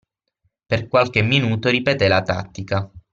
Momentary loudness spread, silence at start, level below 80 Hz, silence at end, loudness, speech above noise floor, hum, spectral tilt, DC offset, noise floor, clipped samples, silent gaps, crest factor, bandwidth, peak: 9 LU; 0.7 s; -50 dBFS; 0.15 s; -19 LUFS; 51 dB; none; -6 dB/octave; under 0.1%; -70 dBFS; under 0.1%; none; 18 dB; 7.4 kHz; -2 dBFS